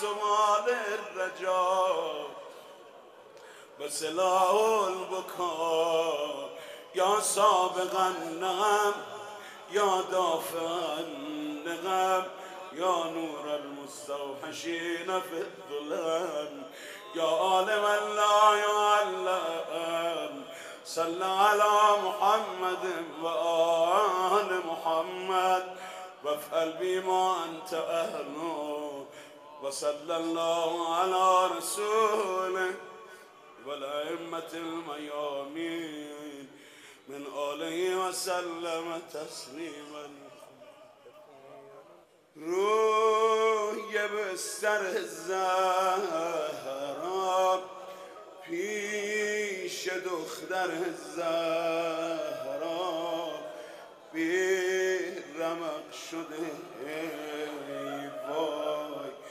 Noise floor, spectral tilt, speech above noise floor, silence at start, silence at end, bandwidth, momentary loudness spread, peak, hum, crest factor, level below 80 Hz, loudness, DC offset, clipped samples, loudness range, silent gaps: -58 dBFS; -2.5 dB/octave; 28 dB; 0 s; 0 s; 15.5 kHz; 17 LU; -10 dBFS; none; 20 dB; -86 dBFS; -30 LUFS; under 0.1%; under 0.1%; 9 LU; none